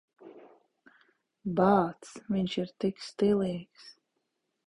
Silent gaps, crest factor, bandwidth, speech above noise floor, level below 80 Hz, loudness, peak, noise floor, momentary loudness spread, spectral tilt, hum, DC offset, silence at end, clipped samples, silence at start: none; 22 dB; 11 kHz; 52 dB; -64 dBFS; -30 LUFS; -10 dBFS; -81 dBFS; 16 LU; -7 dB/octave; none; under 0.1%; 0.75 s; under 0.1%; 0.25 s